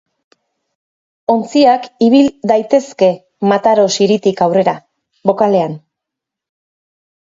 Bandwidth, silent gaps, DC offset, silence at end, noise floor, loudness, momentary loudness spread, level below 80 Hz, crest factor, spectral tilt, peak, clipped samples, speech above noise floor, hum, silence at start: 7.8 kHz; none; under 0.1%; 1.6 s; -82 dBFS; -13 LUFS; 8 LU; -60 dBFS; 14 dB; -5.5 dB/octave; 0 dBFS; under 0.1%; 70 dB; none; 1.3 s